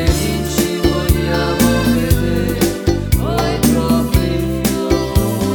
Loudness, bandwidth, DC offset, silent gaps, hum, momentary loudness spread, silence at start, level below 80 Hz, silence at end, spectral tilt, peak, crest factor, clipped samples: -16 LUFS; over 20 kHz; under 0.1%; none; none; 4 LU; 0 s; -22 dBFS; 0 s; -5.5 dB/octave; 0 dBFS; 14 dB; under 0.1%